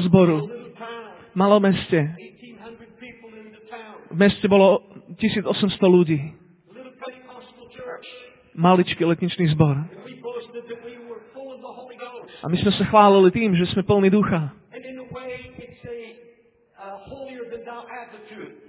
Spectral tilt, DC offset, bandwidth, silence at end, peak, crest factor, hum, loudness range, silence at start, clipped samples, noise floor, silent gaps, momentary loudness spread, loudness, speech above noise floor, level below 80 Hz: -11 dB/octave; under 0.1%; 4 kHz; 0.2 s; -2 dBFS; 20 dB; none; 10 LU; 0 s; under 0.1%; -56 dBFS; none; 23 LU; -19 LUFS; 38 dB; -52 dBFS